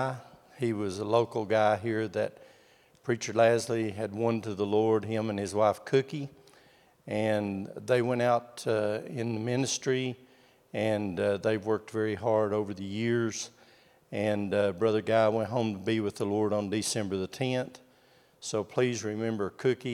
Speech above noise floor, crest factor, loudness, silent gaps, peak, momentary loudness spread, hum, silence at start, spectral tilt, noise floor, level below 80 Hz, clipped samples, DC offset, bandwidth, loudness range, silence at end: 33 dB; 20 dB; -30 LUFS; none; -10 dBFS; 9 LU; none; 0 s; -5.5 dB/octave; -62 dBFS; -76 dBFS; under 0.1%; under 0.1%; 15.5 kHz; 3 LU; 0 s